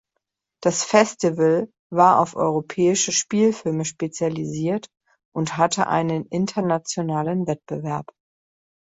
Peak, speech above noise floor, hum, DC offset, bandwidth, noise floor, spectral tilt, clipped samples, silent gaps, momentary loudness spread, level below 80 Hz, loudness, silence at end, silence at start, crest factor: -2 dBFS; 58 dB; none; under 0.1%; 8.4 kHz; -79 dBFS; -4.5 dB/octave; under 0.1%; 1.79-1.90 s, 5.25-5.32 s; 10 LU; -62 dBFS; -21 LUFS; 0.8 s; 0.6 s; 20 dB